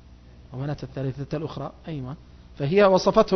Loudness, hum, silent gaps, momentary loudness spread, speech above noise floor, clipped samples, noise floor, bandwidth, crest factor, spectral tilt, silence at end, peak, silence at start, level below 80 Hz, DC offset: -24 LUFS; none; none; 19 LU; 25 dB; under 0.1%; -48 dBFS; 6.4 kHz; 20 dB; -6.5 dB/octave; 0 s; -6 dBFS; 0.4 s; -48 dBFS; under 0.1%